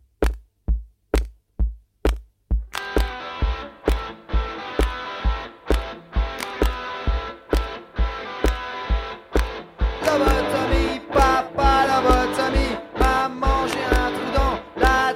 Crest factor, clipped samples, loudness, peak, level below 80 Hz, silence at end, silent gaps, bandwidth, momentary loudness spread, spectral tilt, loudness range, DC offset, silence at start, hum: 20 dB; under 0.1%; -23 LUFS; -2 dBFS; -26 dBFS; 0 s; none; 15.5 kHz; 10 LU; -5.5 dB/octave; 7 LU; under 0.1%; 0.2 s; none